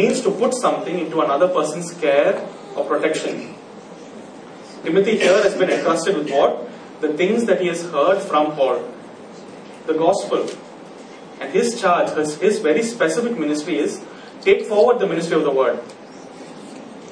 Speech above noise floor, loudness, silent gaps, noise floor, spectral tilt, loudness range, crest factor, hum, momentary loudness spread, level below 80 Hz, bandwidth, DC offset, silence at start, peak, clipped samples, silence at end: 20 dB; -19 LUFS; none; -38 dBFS; -4.5 dB/octave; 4 LU; 18 dB; none; 22 LU; -68 dBFS; 10.5 kHz; under 0.1%; 0 s; -2 dBFS; under 0.1%; 0 s